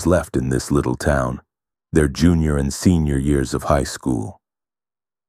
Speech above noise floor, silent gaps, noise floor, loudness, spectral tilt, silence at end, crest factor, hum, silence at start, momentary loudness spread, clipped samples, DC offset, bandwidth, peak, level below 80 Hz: over 72 dB; none; under -90 dBFS; -19 LUFS; -6.5 dB/octave; 0.95 s; 18 dB; none; 0 s; 7 LU; under 0.1%; under 0.1%; 15.5 kHz; -2 dBFS; -30 dBFS